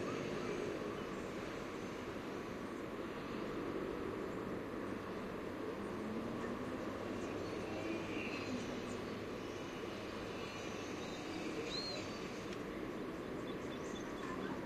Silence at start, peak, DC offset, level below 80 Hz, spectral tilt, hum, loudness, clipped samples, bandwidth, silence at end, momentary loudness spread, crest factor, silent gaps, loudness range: 0 s; -30 dBFS; under 0.1%; -64 dBFS; -5 dB/octave; none; -44 LUFS; under 0.1%; 14.5 kHz; 0 s; 3 LU; 14 dB; none; 1 LU